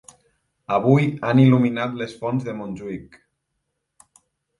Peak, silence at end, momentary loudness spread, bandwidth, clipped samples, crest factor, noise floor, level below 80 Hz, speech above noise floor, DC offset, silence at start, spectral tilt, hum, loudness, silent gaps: -4 dBFS; 1.55 s; 16 LU; 11.5 kHz; under 0.1%; 18 dB; -77 dBFS; -60 dBFS; 57 dB; under 0.1%; 0.7 s; -8.5 dB/octave; none; -20 LUFS; none